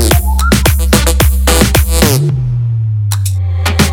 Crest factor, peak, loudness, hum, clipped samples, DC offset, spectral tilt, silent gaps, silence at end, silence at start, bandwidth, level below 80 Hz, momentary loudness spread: 10 dB; 0 dBFS; -11 LUFS; none; 0.4%; under 0.1%; -4.5 dB/octave; none; 0 s; 0 s; 20 kHz; -14 dBFS; 5 LU